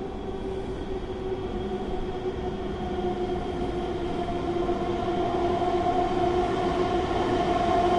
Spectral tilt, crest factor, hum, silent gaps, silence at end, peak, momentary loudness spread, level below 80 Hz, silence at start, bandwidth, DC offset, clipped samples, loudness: -7 dB/octave; 14 dB; none; none; 0 s; -12 dBFS; 8 LU; -40 dBFS; 0 s; 11 kHz; under 0.1%; under 0.1%; -28 LUFS